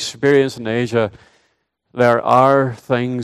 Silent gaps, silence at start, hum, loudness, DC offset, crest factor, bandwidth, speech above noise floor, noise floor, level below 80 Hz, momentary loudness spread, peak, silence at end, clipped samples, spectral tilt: none; 0 s; none; -16 LUFS; under 0.1%; 16 dB; 13 kHz; 50 dB; -65 dBFS; -58 dBFS; 9 LU; 0 dBFS; 0 s; under 0.1%; -6 dB/octave